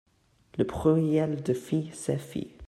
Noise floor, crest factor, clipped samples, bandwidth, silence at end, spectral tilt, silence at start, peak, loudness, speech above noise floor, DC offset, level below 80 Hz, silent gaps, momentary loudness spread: -59 dBFS; 18 dB; under 0.1%; 13 kHz; 0 s; -7.5 dB/octave; 0.55 s; -12 dBFS; -28 LUFS; 32 dB; under 0.1%; -54 dBFS; none; 8 LU